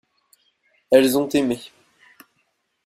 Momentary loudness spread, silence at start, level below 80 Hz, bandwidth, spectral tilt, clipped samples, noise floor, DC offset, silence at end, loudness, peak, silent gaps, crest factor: 10 LU; 0.9 s; -60 dBFS; 16 kHz; -4.5 dB/octave; under 0.1%; -70 dBFS; under 0.1%; 1.2 s; -19 LUFS; -2 dBFS; none; 22 dB